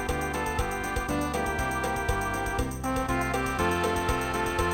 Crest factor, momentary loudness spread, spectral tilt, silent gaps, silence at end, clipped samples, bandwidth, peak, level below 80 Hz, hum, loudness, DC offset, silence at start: 16 dB; 3 LU; -4.5 dB/octave; none; 0 s; under 0.1%; 17.5 kHz; -12 dBFS; -36 dBFS; none; -28 LUFS; under 0.1%; 0 s